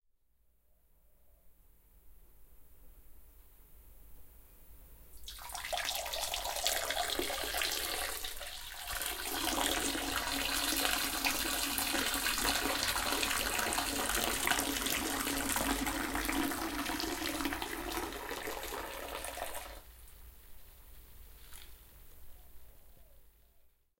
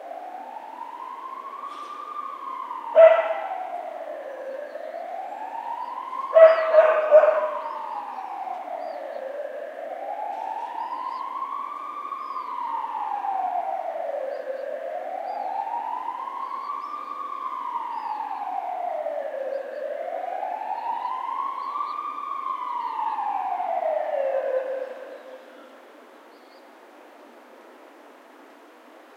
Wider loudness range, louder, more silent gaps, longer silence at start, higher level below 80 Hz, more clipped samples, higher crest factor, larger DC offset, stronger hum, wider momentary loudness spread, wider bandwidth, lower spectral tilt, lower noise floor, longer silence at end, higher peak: about the same, 13 LU vs 12 LU; second, -34 LUFS vs -26 LUFS; neither; first, 1.3 s vs 0 s; first, -52 dBFS vs under -90 dBFS; neither; about the same, 28 dB vs 24 dB; neither; neither; second, 12 LU vs 18 LU; first, 17 kHz vs 6.4 kHz; about the same, -1.5 dB/octave vs -2 dB/octave; first, -71 dBFS vs -49 dBFS; first, 0.4 s vs 0 s; second, -10 dBFS vs -2 dBFS